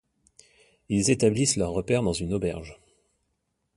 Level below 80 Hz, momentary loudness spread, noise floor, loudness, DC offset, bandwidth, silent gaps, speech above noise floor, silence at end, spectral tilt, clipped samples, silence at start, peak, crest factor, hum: -48 dBFS; 10 LU; -77 dBFS; -25 LUFS; under 0.1%; 11.5 kHz; none; 52 dB; 1.05 s; -4.5 dB/octave; under 0.1%; 0.9 s; -8 dBFS; 20 dB; none